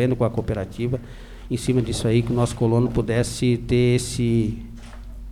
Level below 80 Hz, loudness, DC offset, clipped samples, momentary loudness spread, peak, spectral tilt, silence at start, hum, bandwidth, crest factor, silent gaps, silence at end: -38 dBFS; -22 LUFS; under 0.1%; under 0.1%; 20 LU; -8 dBFS; -6.5 dB/octave; 0 s; none; 13.5 kHz; 14 dB; none; 0 s